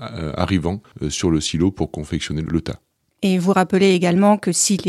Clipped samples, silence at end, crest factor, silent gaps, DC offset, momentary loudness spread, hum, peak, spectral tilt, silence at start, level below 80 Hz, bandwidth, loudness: under 0.1%; 0 s; 16 dB; none; under 0.1%; 11 LU; none; -2 dBFS; -5 dB/octave; 0 s; -40 dBFS; 13.5 kHz; -19 LUFS